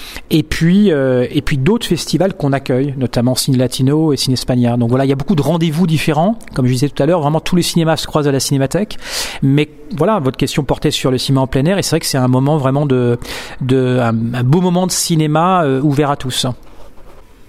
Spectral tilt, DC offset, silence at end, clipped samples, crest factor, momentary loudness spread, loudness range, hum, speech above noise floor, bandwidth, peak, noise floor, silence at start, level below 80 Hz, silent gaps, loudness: -5.5 dB/octave; under 0.1%; 0.05 s; under 0.1%; 14 dB; 5 LU; 1 LU; none; 21 dB; 16 kHz; 0 dBFS; -34 dBFS; 0 s; -36 dBFS; none; -14 LUFS